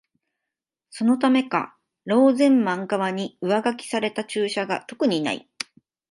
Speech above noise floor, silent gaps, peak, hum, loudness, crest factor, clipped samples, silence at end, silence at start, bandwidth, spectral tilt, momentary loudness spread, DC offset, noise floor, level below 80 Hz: 64 dB; none; -6 dBFS; none; -22 LUFS; 18 dB; under 0.1%; 0.7 s; 0.95 s; 11.5 kHz; -5 dB/octave; 16 LU; under 0.1%; -86 dBFS; -74 dBFS